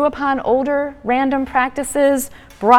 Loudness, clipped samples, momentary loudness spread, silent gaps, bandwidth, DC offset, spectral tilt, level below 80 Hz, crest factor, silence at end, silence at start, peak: -18 LUFS; under 0.1%; 5 LU; none; 17 kHz; under 0.1%; -4 dB/octave; -46 dBFS; 16 dB; 0 s; 0 s; 0 dBFS